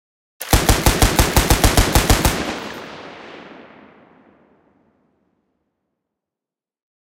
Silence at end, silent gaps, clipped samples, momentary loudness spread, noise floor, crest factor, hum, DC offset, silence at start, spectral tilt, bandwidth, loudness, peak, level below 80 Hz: 3.55 s; none; under 0.1%; 22 LU; -89 dBFS; 20 dB; none; under 0.1%; 0.4 s; -3.5 dB/octave; 17 kHz; -16 LUFS; 0 dBFS; -24 dBFS